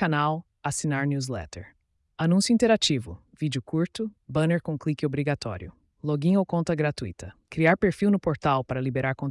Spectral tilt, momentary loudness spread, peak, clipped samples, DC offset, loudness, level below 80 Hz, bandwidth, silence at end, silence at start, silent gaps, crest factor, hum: -5.5 dB/octave; 14 LU; -10 dBFS; under 0.1%; under 0.1%; -26 LUFS; -54 dBFS; 12 kHz; 0 s; 0 s; none; 16 dB; none